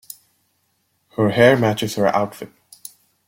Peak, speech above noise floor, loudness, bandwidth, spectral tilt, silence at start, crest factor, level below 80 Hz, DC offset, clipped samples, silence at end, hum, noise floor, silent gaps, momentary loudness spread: -2 dBFS; 50 dB; -17 LUFS; 16.5 kHz; -5.5 dB/octave; 1.2 s; 18 dB; -58 dBFS; under 0.1%; under 0.1%; 0.8 s; none; -67 dBFS; none; 25 LU